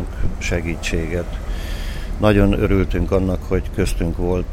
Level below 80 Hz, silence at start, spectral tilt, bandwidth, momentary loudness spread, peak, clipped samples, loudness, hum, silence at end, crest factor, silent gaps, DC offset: -24 dBFS; 0 s; -6.5 dB/octave; 15.5 kHz; 12 LU; -2 dBFS; under 0.1%; -21 LUFS; none; 0 s; 18 dB; none; under 0.1%